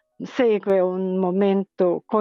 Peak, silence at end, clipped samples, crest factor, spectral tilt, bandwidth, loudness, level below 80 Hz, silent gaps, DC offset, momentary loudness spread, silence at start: -8 dBFS; 0 s; under 0.1%; 12 dB; -8.5 dB/octave; 6.8 kHz; -21 LUFS; -72 dBFS; none; under 0.1%; 3 LU; 0.2 s